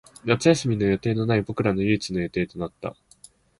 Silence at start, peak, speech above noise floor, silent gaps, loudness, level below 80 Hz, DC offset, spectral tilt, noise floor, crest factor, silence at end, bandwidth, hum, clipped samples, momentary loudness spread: 0.25 s; -4 dBFS; 30 dB; none; -24 LUFS; -50 dBFS; under 0.1%; -6 dB/octave; -53 dBFS; 20 dB; 0.7 s; 11.5 kHz; none; under 0.1%; 12 LU